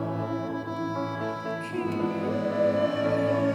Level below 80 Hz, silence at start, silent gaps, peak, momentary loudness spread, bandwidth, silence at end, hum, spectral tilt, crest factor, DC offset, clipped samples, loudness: -66 dBFS; 0 s; none; -14 dBFS; 7 LU; 11.5 kHz; 0 s; none; -7.5 dB/octave; 14 dB; under 0.1%; under 0.1%; -28 LUFS